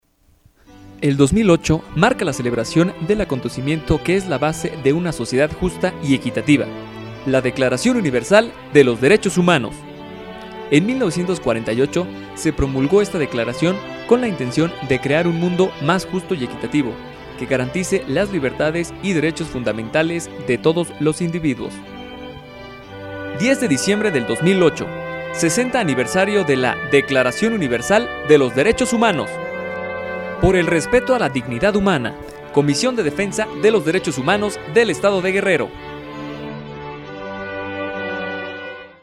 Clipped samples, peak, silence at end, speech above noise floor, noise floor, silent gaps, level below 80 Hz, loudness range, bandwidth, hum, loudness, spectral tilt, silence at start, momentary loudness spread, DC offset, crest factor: under 0.1%; 0 dBFS; 0.1 s; 37 dB; -55 dBFS; none; -42 dBFS; 5 LU; 14.5 kHz; none; -18 LUFS; -5.5 dB/octave; 0.75 s; 15 LU; under 0.1%; 18 dB